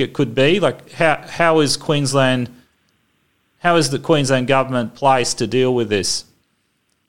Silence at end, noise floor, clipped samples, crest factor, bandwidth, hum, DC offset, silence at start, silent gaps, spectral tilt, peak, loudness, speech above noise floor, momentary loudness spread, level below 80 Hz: 0 s; -66 dBFS; under 0.1%; 16 dB; 16.5 kHz; none; 1%; 0 s; none; -4.5 dB/octave; -2 dBFS; -17 LUFS; 49 dB; 6 LU; -52 dBFS